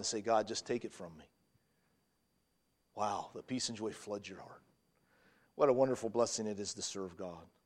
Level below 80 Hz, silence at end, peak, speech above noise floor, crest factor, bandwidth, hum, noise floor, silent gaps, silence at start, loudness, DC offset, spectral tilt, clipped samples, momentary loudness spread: -76 dBFS; 0.2 s; -16 dBFS; 42 dB; 24 dB; 13 kHz; none; -79 dBFS; none; 0 s; -37 LUFS; under 0.1%; -3.5 dB/octave; under 0.1%; 19 LU